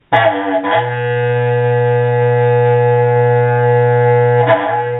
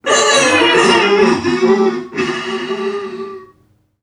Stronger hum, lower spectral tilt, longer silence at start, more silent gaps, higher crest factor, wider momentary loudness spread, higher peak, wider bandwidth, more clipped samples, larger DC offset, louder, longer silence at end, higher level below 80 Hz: neither; first, -10 dB/octave vs -2.5 dB/octave; about the same, 0.1 s vs 0.05 s; neither; about the same, 12 dB vs 14 dB; second, 4 LU vs 14 LU; about the same, 0 dBFS vs 0 dBFS; second, 4 kHz vs 11.5 kHz; neither; neither; about the same, -13 LUFS vs -13 LUFS; second, 0 s vs 0.6 s; about the same, -56 dBFS vs -54 dBFS